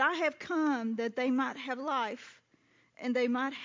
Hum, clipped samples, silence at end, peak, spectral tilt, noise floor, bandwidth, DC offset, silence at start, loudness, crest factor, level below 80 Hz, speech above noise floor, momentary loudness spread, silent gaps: none; under 0.1%; 0 s; -16 dBFS; -4.5 dB/octave; -68 dBFS; 7.6 kHz; under 0.1%; 0 s; -32 LUFS; 18 dB; -84 dBFS; 36 dB; 8 LU; none